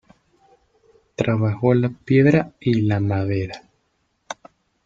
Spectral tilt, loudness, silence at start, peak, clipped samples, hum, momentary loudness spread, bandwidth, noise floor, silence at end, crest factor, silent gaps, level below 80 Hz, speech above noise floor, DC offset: -8 dB/octave; -20 LUFS; 1.2 s; -2 dBFS; under 0.1%; none; 20 LU; 7.4 kHz; -69 dBFS; 0.5 s; 20 dB; none; -54 dBFS; 50 dB; under 0.1%